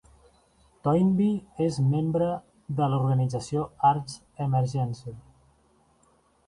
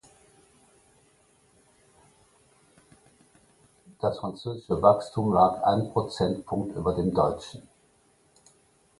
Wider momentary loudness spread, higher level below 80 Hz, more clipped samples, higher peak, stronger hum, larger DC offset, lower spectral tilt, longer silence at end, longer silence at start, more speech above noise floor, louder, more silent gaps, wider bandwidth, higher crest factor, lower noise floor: second, 10 LU vs 13 LU; about the same, -58 dBFS vs -54 dBFS; neither; second, -10 dBFS vs -4 dBFS; neither; neither; about the same, -8 dB/octave vs -7.5 dB/octave; about the same, 1.3 s vs 1.4 s; second, 0.85 s vs 4 s; about the same, 39 dB vs 39 dB; about the same, -26 LUFS vs -26 LUFS; neither; about the same, 11 kHz vs 11.5 kHz; second, 16 dB vs 24 dB; about the same, -64 dBFS vs -64 dBFS